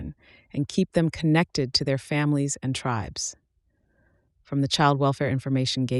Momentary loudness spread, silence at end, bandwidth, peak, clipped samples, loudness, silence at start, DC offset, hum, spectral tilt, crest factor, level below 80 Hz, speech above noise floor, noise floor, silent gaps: 10 LU; 0 s; 12 kHz; -6 dBFS; under 0.1%; -25 LUFS; 0 s; under 0.1%; none; -5 dB/octave; 18 dB; -52 dBFS; 45 dB; -69 dBFS; none